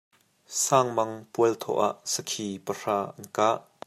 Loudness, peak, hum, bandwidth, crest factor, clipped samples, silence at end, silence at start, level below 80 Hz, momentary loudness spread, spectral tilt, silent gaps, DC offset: -27 LUFS; -6 dBFS; none; 15.5 kHz; 22 dB; under 0.1%; 0.25 s; 0.5 s; -76 dBFS; 10 LU; -3.5 dB/octave; none; under 0.1%